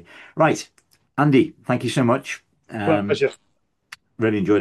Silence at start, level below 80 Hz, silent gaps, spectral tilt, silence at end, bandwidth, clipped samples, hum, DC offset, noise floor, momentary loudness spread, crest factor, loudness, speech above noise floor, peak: 0.2 s; -64 dBFS; none; -6.5 dB/octave; 0 s; 12.5 kHz; under 0.1%; none; under 0.1%; -47 dBFS; 16 LU; 18 dB; -21 LUFS; 27 dB; -4 dBFS